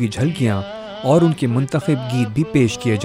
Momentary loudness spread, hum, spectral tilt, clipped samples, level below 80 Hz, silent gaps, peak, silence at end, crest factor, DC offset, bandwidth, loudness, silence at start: 7 LU; none; -7 dB/octave; under 0.1%; -50 dBFS; none; -2 dBFS; 0 s; 16 dB; under 0.1%; 15.5 kHz; -18 LUFS; 0 s